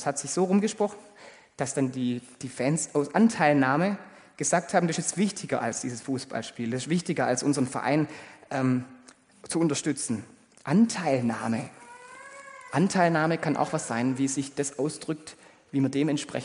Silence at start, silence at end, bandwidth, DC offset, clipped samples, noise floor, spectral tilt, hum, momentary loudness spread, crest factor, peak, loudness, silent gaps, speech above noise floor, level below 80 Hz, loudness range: 0 s; 0 s; 10.5 kHz; under 0.1%; under 0.1%; -54 dBFS; -5 dB/octave; none; 14 LU; 20 dB; -8 dBFS; -27 LUFS; none; 28 dB; -70 dBFS; 3 LU